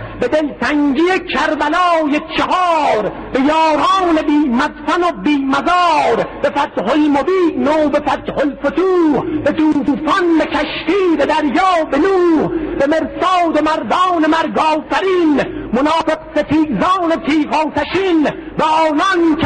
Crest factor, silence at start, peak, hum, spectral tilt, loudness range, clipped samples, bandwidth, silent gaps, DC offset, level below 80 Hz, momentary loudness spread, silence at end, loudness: 10 dB; 0 s; -4 dBFS; none; -5.5 dB/octave; 1 LU; under 0.1%; 9.4 kHz; none; under 0.1%; -42 dBFS; 4 LU; 0 s; -14 LUFS